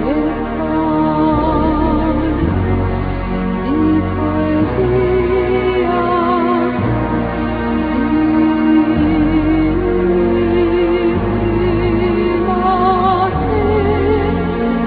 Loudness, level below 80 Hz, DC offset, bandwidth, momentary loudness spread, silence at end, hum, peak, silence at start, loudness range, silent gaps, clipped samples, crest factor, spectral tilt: -15 LUFS; -26 dBFS; under 0.1%; 4.9 kHz; 4 LU; 0 s; none; -2 dBFS; 0 s; 2 LU; none; under 0.1%; 12 dB; -11 dB/octave